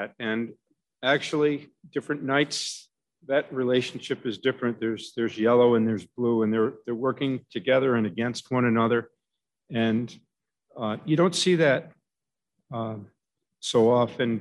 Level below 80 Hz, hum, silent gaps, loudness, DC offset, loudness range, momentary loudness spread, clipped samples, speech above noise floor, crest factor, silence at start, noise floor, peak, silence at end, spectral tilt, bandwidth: -72 dBFS; none; none; -25 LUFS; under 0.1%; 3 LU; 12 LU; under 0.1%; 65 dB; 16 dB; 0 s; -90 dBFS; -8 dBFS; 0 s; -5.5 dB/octave; 12 kHz